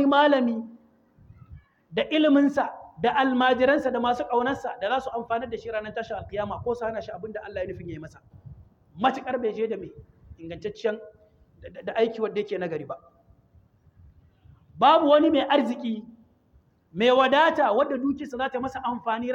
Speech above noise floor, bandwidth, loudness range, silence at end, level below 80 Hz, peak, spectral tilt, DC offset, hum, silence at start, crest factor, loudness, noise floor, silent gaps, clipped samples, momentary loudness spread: 37 dB; 7.8 kHz; 9 LU; 0 s; -58 dBFS; -6 dBFS; -6 dB/octave; under 0.1%; none; 0 s; 20 dB; -25 LUFS; -61 dBFS; none; under 0.1%; 17 LU